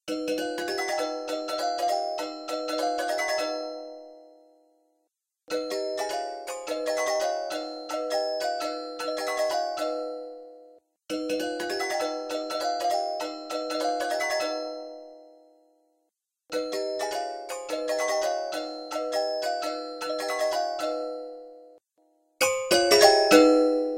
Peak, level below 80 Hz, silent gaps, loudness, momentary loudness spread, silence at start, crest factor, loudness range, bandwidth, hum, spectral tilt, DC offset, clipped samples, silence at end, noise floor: -4 dBFS; -72 dBFS; none; -27 LUFS; 12 LU; 0.05 s; 24 dB; 4 LU; 17 kHz; none; -1.5 dB/octave; under 0.1%; under 0.1%; 0 s; -78 dBFS